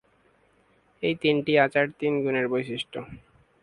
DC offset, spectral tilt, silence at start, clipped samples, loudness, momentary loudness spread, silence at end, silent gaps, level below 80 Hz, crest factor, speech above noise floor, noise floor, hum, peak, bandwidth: under 0.1%; -6.5 dB/octave; 1 s; under 0.1%; -25 LUFS; 13 LU; 0.45 s; none; -62 dBFS; 22 dB; 38 dB; -63 dBFS; none; -6 dBFS; 11 kHz